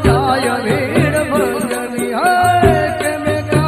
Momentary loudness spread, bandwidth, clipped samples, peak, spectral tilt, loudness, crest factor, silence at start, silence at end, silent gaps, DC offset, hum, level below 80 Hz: 7 LU; 15.5 kHz; under 0.1%; 0 dBFS; -5.5 dB/octave; -15 LUFS; 14 dB; 0 s; 0 s; none; under 0.1%; none; -34 dBFS